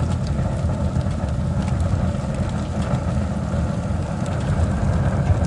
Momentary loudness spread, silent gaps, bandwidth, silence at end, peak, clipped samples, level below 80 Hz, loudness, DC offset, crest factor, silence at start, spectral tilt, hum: 4 LU; none; 11 kHz; 0 s; -8 dBFS; under 0.1%; -30 dBFS; -23 LUFS; under 0.1%; 14 dB; 0 s; -7.5 dB/octave; none